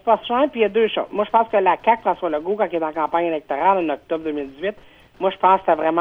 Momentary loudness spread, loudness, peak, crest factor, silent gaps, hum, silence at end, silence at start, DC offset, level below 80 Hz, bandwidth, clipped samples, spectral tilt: 8 LU; -20 LUFS; -2 dBFS; 16 dB; none; none; 0 s; 0.05 s; under 0.1%; -56 dBFS; 5 kHz; under 0.1%; -7 dB/octave